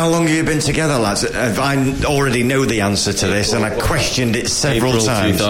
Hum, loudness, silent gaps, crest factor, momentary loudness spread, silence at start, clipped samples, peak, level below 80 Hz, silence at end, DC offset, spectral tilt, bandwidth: none; -16 LUFS; none; 14 dB; 2 LU; 0 s; under 0.1%; -2 dBFS; -32 dBFS; 0 s; under 0.1%; -4 dB/octave; 17 kHz